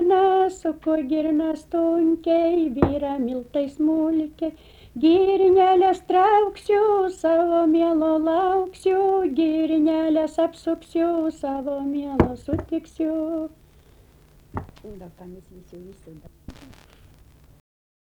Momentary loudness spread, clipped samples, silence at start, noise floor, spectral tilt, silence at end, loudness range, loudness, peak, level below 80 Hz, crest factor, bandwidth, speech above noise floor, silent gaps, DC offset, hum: 13 LU; under 0.1%; 0 s; -53 dBFS; -7.5 dB/octave; 1.5 s; 14 LU; -21 LUFS; -4 dBFS; -46 dBFS; 18 dB; 11 kHz; 31 dB; none; under 0.1%; none